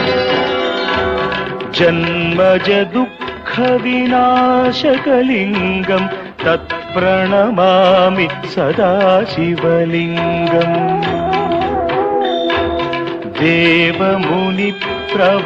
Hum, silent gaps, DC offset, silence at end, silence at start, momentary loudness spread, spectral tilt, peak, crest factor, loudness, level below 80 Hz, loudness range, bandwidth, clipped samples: none; none; under 0.1%; 0 s; 0 s; 7 LU; -7 dB/octave; 0 dBFS; 14 dB; -14 LUFS; -44 dBFS; 2 LU; 7.6 kHz; under 0.1%